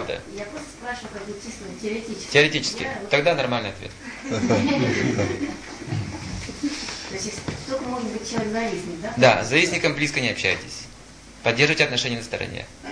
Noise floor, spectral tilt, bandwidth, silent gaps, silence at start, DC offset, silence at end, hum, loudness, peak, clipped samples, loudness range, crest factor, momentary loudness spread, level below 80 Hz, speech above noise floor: -44 dBFS; -4 dB/octave; 10.5 kHz; none; 0 s; under 0.1%; 0 s; none; -23 LUFS; -2 dBFS; under 0.1%; 7 LU; 22 dB; 17 LU; -50 dBFS; 21 dB